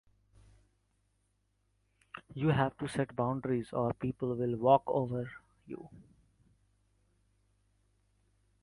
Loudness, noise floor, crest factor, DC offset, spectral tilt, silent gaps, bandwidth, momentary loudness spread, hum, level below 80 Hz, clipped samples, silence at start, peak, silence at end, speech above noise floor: -32 LUFS; -77 dBFS; 24 dB; under 0.1%; -8 dB/octave; none; 11.5 kHz; 21 LU; 50 Hz at -60 dBFS; -64 dBFS; under 0.1%; 2.15 s; -12 dBFS; 2.6 s; 44 dB